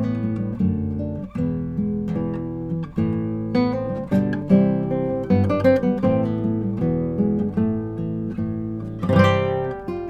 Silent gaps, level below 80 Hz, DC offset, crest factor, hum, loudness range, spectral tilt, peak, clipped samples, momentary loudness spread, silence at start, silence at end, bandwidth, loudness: none; -46 dBFS; under 0.1%; 20 dB; none; 4 LU; -9 dB/octave; -2 dBFS; under 0.1%; 9 LU; 0 s; 0 s; 7.6 kHz; -22 LUFS